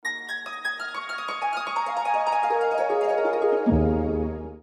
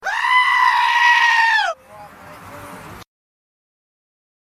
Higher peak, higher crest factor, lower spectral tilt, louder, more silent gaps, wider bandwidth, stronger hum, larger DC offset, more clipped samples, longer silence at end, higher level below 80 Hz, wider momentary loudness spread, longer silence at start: second, -10 dBFS vs -4 dBFS; about the same, 16 dB vs 16 dB; first, -6.5 dB/octave vs 0 dB/octave; second, -25 LUFS vs -14 LUFS; neither; second, 13 kHz vs 15.5 kHz; neither; neither; neither; second, 0.05 s vs 1.4 s; first, -40 dBFS vs -58 dBFS; second, 9 LU vs 24 LU; about the same, 0.05 s vs 0.05 s